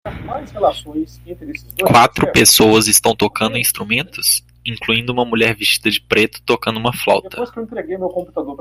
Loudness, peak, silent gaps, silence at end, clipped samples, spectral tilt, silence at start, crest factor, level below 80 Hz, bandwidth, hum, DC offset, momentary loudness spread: -14 LUFS; 0 dBFS; none; 0.05 s; under 0.1%; -3 dB/octave; 0.05 s; 16 dB; -44 dBFS; 16 kHz; none; under 0.1%; 17 LU